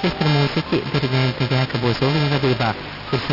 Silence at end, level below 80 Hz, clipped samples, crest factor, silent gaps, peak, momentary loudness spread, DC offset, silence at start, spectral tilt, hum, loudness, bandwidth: 0 s; -44 dBFS; under 0.1%; 14 dB; none; -6 dBFS; 5 LU; under 0.1%; 0 s; -7 dB/octave; none; -20 LUFS; 5.8 kHz